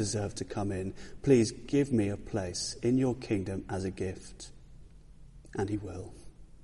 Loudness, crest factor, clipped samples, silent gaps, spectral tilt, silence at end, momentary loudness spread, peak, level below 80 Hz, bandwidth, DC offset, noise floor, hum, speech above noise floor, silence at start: -32 LUFS; 20 dB; under 0.1%; none; -6 dB/octave; 0 s; 18 LU; -12 dBFS; -52 dBFS; 11.5 kHz; under 0.1%; -52 dBFS; none; 21 dB; 0 s